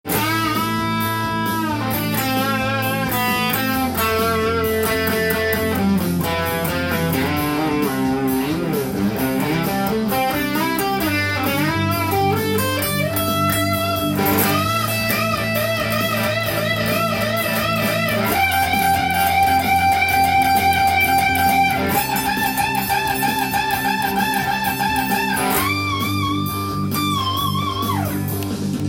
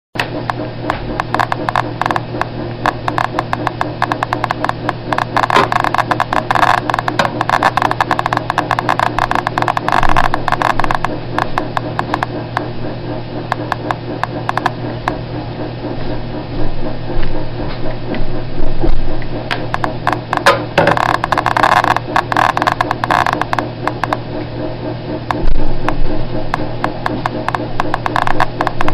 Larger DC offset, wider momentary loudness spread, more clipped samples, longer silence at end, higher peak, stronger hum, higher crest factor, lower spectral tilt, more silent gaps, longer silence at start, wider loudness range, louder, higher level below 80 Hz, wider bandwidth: second, under 0.1% vs 1%; second, 5 LU vs 10 LU; neither; about the same, 0 s vs 0 s; about the same, -2 dBFS vs 0 dBFS; neither; about the same, 16 dB vs 14 dB; about the same, -4.5 dB/octave vs -5.5 dB/octave; neither; about the same, 0.05 s vs 0.15 s; second, 4 LU vs 8 LU; about the same, -19 LUFS vs -17 LUFS; second, -44 dBFS vs -22 dBFS; first, 17 kHz vs 11.5 kHz